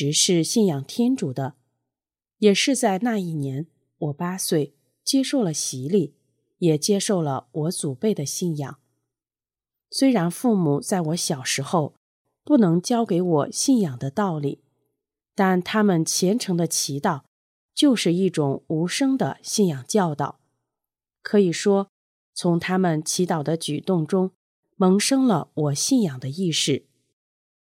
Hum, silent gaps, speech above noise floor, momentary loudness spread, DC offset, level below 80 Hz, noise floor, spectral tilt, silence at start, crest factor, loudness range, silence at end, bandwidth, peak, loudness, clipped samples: none; 11.97-12.25 s, 17.28-17.69 s, 21.89-22.33 s, 24.36-24.63 s; over 68 dB; 10 LU; under 0.1%; -74 dBFS; under -90 dBFS; -4.5 dB/octave; 0 s; 18 dB; 3 LU; 0.9 s; 16.5 kHz; -6 dBFS; -22 LUFS; under 0.1%